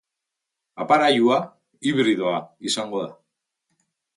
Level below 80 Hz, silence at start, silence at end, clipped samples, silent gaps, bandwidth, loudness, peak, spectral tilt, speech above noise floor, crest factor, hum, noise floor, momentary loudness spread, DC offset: -72 dBFS; 0.75 s; 1.05 s; under 0.1%; none; 11.5 kHz; -21 LUFS; -4 dBFS; -4 dB/octave; 63 dB; 18 dB; none; -84 dBFS; 15 LU; under 0.1%